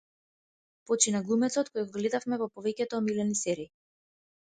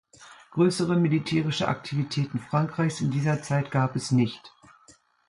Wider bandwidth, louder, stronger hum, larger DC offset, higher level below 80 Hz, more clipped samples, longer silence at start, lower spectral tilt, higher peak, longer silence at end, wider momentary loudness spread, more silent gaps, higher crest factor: second, 9.6 kHz vs 11.5 kHz; second, -30 LUFS vs -26 LUFS; neither; neither; second, -74 dBFS vs -62 dBFS; neither; first, 0.9 s vs 0.2 s; second, -3.5 dB/octave vs -6.5 dB/octave; about the same, -8 dBFS vs -10 dBFS; first, 0.95 s vs 0.8 s; about the same, 8 LU vs 6 LU; neither; first, 24 dB vs 16 dB